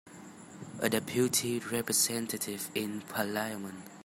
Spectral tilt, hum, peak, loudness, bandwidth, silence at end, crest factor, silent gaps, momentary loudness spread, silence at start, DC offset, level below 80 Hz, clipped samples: -3 dB/octave; none; -12 dBFS; -32 LUFS; 16 kHz; 0 s; 22 dB; none; 19 LU; 0.05 s; under 0.1%; -72 dBFS; under 0.1%